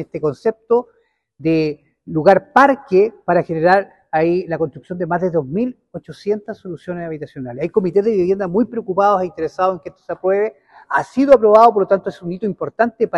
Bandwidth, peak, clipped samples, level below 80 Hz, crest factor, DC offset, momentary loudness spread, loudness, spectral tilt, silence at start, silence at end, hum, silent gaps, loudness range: 10.5 kHz; 0 dBFS; 0.1%; -56 dBFS; 16 dB; under 0.1%; 15 LU; -17 LUFS; -8 dB/octave; 0 s; 0 s; none; none; 6 LU